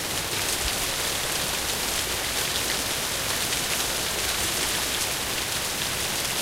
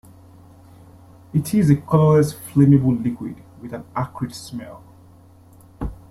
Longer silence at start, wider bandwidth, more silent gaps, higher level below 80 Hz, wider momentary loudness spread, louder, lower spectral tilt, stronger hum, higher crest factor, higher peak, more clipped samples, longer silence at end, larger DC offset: second, 0 s vs 1.35 s; first, 16 kHz vs 14.5 kHz; neither; about the same, -44 dBFS vs -44 dBFS; second, 2 LU vs 20 LU; second, -24 LUFS vs -19 LUFS; second, -1 dB/octave vs -8 dB/octave; neither; about the same, 18 dB vs 18 dB; second, -10 dBFS vs -4 dBFS; neither; second, 0 s vs 0.15 s; neither